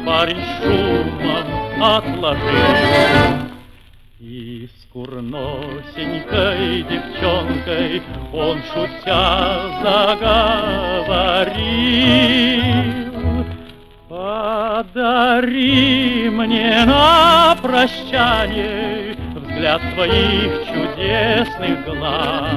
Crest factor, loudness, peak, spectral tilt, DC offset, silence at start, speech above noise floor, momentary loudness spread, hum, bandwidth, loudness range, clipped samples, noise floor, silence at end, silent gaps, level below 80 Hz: 16 dB; -16 LUFS; 0 dBFS; -6 dB/octave; under 0.1%; 0 s; 28 dB; 14 LU; none; 13.5 kHz; 8 LU; under 0.1%; -44 dBFS; 0 s; none; -34 dBFS